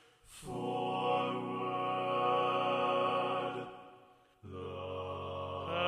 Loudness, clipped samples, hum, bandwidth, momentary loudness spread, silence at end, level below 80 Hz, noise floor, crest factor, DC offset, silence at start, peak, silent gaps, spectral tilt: -35 LUFS; under 0.1%; none; 13 kHz; 15 LU; 0 s; -70 dBFS; -62 dBFS; 16 dB; under 0.1%; 0.3 s; -20 dBFS; none; -5.5 dB/octave